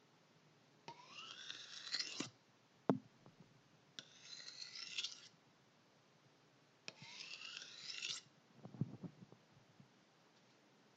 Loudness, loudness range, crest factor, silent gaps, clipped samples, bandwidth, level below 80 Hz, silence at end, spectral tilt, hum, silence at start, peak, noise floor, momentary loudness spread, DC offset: -48 LUFS; 5 LU; 32 dB; none; under 0.1%; 8.8 kHz; under -90 dBFS; 0 s; -3.5 dB/octave; none; 0 s; -20 dBFS; -72 dBFS; 24 LU; under 0.1%